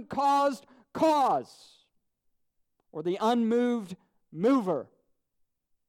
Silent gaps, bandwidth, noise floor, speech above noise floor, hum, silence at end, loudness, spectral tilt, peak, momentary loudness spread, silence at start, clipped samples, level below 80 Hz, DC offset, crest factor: none; 15.5 kHz; -76 dBFS; 49 dB; none; 1.05 s; -27 LUFS; -6 dB/octave; -14 dBFS; 19 LU; 0 s; under 0.1%; -74 dBFS; under 0.1%; 16 dB